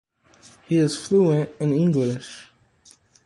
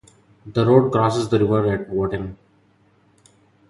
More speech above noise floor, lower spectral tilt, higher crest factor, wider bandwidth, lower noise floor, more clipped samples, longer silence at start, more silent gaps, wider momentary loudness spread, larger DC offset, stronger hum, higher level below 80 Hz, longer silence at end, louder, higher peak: second, 35 dB vs 40 dB; about the same, -7 dB/octave vs -7.5 dB/octave; about the same, 16 dB vs 20 dB; about the same, 11.5 kHz vs 11.5 kHz; about the same, -56 dBFS vs -58 dBFS; neither; first, 0.7 s vs 0.45 s; neither; first, 15 LU vs 11 LU; neither; neither; second, -62 dBFS vs -48 dBFS; second, 0.85 s vs 1.35 s; second, -22 LUFS vs -19 LUFS; second, -8 dBFS vs -2 dBFS